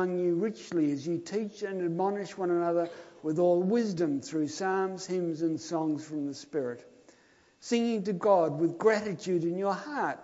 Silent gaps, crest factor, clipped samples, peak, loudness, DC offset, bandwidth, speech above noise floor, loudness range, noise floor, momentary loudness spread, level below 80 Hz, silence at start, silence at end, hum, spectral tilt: none; 18 dB; under 0.1%; -12 dBFS; -30 LUFS; under 0.1%; 8 kHz; 33 dB; 4 LU; -63 dBFS; 9 LU; -78 dBFS; 0 s; 0 s; none; -6 dB/octave